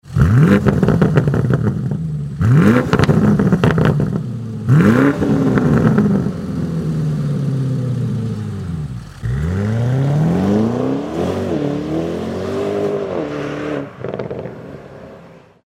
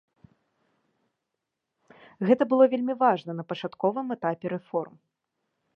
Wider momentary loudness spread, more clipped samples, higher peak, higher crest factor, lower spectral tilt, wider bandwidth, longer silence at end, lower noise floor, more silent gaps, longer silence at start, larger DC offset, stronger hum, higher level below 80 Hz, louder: about the same, 13 LU vs 12 LU; neither; first, 0 dBFS vs -6 dBFS; second, 16 dB vs 22 dB; about the same, -8.5 dB/octave vs -8.5 dB/octave; first, 12.5 kHz vs 5.8 kHz; second, 0.25 s vs 0.9 s; second, -42 dBFS vs -84 dBFS; neither; second, 0.05 s vs 2.2 s; neither; neither; first, -34 dBFS vs -80 dBFS; first, -16 LUFS vs -26 LUFS